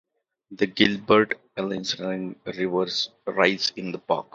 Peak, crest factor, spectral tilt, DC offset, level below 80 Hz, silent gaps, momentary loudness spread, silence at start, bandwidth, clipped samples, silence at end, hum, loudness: -2 dBFS; 22 dB; -4.5 dB/octave; under 0.1%; -62 dBFS; none; 10 LU; 0.5 s; 7.8 kHz; under 0.1%; 0.15 s; none; -24 LUFS